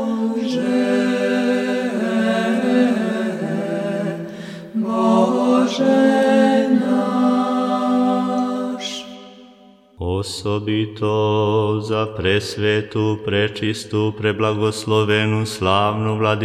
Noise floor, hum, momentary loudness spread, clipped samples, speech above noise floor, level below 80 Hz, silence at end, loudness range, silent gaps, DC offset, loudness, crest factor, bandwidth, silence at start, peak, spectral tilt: -48 dBFS; none; 9 LU; under 0.1%; 29 dB; -54 dBFS; 0 s; 6 LU; none; under 0.1%; -19 LUFS; 16 dB; 13 kHz; 0 s; -2 dBFS; -6 dB/octave